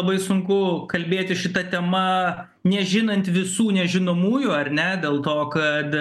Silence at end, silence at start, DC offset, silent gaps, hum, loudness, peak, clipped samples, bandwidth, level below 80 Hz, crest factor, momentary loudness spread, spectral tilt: 0 s; 0 s; under 0.1%; none; none; -22 LUFS; -4 dBFS; under 0.1%; 12.5 kHz; -64 dBFS; 16 dB; 3 LU; -5.5 dB/octave